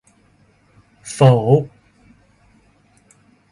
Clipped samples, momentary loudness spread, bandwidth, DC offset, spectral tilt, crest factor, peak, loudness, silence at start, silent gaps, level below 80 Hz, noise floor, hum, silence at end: under 0.1%; 23 LU; 11.5 kHz; under 0.1%; -7.5 dB/octave; 20 dB; 0 dBFS; -15 LUFS; 1.05 s; none; -56 dBFS; -56 dBFS; none; 1.85 s